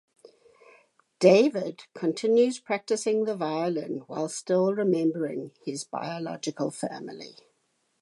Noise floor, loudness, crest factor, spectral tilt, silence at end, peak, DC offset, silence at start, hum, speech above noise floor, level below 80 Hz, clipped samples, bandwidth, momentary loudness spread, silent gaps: -73 dBFS; -27 LUFS; 22 dB; -5.5 dB/octave; 0.7 s; -6 dBFS; under 0.1%; 1.2 s; none; 47 dB; -82 dBFS; under 0.1%; 11.5 kHz; 14 LU; none